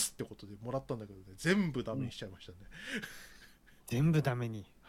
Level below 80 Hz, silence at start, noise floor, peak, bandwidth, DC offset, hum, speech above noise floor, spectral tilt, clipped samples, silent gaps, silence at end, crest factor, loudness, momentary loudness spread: -60 dBFS; 0 s; -60 dBFS; -16 dBFS; 16 kHz; under 0.1%; none; 24 dB; -5.5 dB/octave; under 0.1%; none; 0 s; 20 dB; -36 LUFS; 21 LU